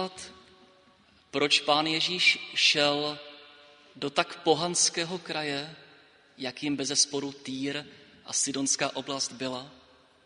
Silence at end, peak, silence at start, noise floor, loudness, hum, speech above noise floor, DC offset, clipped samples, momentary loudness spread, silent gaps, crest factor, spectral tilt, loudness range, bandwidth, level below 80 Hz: 0.5 s; -6 dBFS; 0 s; -61 dBFS; -27 LUFS; none; 32 dB; under 0.1%; under 0.1%; 15 LU; none; 24 dB; -1.5 dB/octave; 5 LU; 10.5 kHz; -72 dBFS